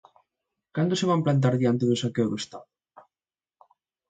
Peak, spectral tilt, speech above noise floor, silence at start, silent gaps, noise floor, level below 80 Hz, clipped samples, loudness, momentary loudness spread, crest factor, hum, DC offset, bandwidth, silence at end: -10 dBFS; -6.5 dB/octave; over 66 dB; 0.75 s; none; under -90 dBFS; -66 dBFS; under 0.1%; -25 LUFS; 13 LU; 16 dB; none; under 0.1%; 9.2 kHz; 1.45 s